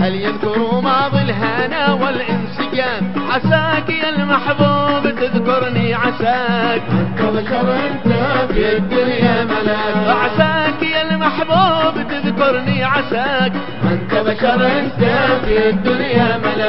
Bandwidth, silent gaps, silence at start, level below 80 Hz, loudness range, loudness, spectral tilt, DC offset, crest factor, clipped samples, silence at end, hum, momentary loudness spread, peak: 5.8 kHz; none; 0 s; -38 dBFS; 1 LU; -15 LUFS; -11.5 dB/octave; 4%; 16 dB; under 0.1%; 0 s; none; 4 LU; 0 dBFS